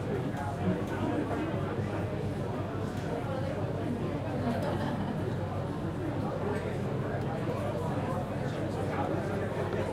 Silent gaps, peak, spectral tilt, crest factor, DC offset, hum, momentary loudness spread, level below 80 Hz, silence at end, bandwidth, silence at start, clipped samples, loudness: none; -18 dBFS; -7.5 dB/octave; 14 dB; under 0.1%; none; 3 LU; -52 dBFS; 0 s; 15 kHz; 0 s; under 0.1%; -33 LUFS